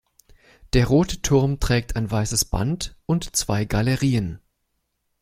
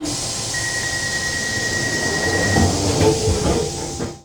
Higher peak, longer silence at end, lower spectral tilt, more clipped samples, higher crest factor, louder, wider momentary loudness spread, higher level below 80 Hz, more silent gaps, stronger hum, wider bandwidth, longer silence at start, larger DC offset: about the same, -4 dBFS vs -6 dBFS; first, 0.85 s vs 0.05 s; first, -5 dB/octave vs -3.5 dB/octave; neither; about the same, 18 dB vs 14 dB; second, -22 LUFS vs -19 LUFS; about the same, 6 LU vs 5 LU; about the same, -34 dBFS vs -34 dBFS; neither; neither; second, 16 kHz vs 19.5 kHz; first, 0.65 s vs 0 s; neither